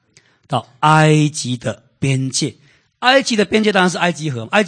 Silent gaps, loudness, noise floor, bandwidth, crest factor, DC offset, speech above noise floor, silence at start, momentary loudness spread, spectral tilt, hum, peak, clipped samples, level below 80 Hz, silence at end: none; -16 LUFS; -53 dBFS; 9.8 kHz; 16 dB; under 0.1%; 38 dB; 0.5 s; 12 LU; -4.5 dB/octave; none; 0 dBFS; under 0.1%; -56 dBFS; 0 s